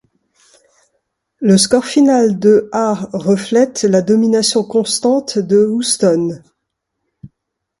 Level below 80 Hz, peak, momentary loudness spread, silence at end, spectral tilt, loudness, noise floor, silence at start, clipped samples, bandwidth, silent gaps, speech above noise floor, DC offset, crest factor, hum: -56 dBFS; 0 dBFS; 7 LU; 0.55 s; -4.5 dB/octave; -13 LUFS; -75 dBFS; 1.4 s; under 0.1%; 11.5 kHz; none; 62 dB; under 0.1%; 14 dB; none